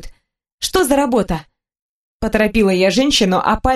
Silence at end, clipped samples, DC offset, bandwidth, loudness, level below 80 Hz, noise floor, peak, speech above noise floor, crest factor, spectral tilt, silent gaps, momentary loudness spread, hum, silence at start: 0 s; under 0.1%; under 0.1%; 13 kHz; -16 LUFS; -34 dBFS; -38 dBFS; 0 dBFS; 24 dB; 16 dB; -4 dB/octave; 0.53-0.58 s, 1.82-2.20 s; 10 LU; none; 0.05 s